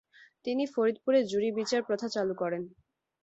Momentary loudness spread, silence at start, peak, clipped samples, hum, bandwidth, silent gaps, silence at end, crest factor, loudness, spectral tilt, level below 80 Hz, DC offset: 10 LU; 0.45 s; -14 dBFS; under 0.1%; none; 8.2 kHz; none; 0.55 s; 16 dB; -30 LUFS; -5 dB/octave; -74 dBFS; under 0.1%